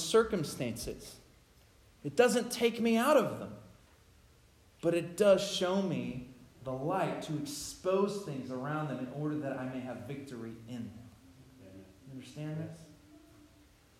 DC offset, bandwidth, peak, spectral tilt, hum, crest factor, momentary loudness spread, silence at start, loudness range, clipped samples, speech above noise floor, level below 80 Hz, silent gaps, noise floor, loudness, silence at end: under 0.1%; 16 kHz; -12 dBFS; -5 dB/octave; none; 22 dB; 20 LU; 0 s; 13 LU; under 0.1%; 30 dB; -64 dBFS; none; -63 dBFS; -33 LUFS; 0.8 s